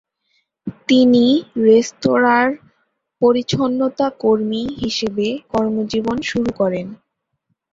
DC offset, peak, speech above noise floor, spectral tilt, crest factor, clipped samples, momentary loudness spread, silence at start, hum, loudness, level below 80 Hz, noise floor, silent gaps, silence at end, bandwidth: under 0.1%; -2 dBFS; 56 dB; -5.5 dB/octave; 16 dB; under 0.1%; 9 LU; 0.65 s; none; -17 LUFS; -52 dBFS; -72 dBFS; none; 0.75 s; 7.6 kHz